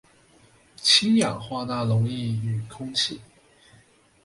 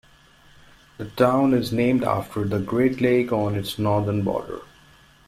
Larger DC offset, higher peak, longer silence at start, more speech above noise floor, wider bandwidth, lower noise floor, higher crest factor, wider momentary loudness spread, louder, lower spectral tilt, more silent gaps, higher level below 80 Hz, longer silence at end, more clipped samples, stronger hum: neither; about the same, -6 dBFS vs -4 dBFS; second, 0.8 s vs 1 s; about the same, 34 dB vs 31 dB; second, 11.5 kHz vs 16 kHz; first, -57 dBFS vs -53 dBFS; about the same, 20 dB vs 18 dB; about the same, 13 LU vs 12 LU; about the same, -23 LUFS vs -22 LUFS; second, -4 dB/octave vs -7 dB/octave; neither; second, -60 dBFS vs -52 dBFS; first, 1 s vs 0.65 s; neither; neither